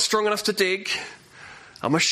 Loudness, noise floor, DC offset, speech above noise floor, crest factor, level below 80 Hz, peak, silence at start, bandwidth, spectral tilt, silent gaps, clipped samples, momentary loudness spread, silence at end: -23 LUFS; -45 dBFS; under 0.1%; 22 dB; 16 dB; -66 dBFS; -8 dBFS; 0 s; 15 kHz; -2.5 dB/octave; none; under 0.1%; 22 LU; 0 s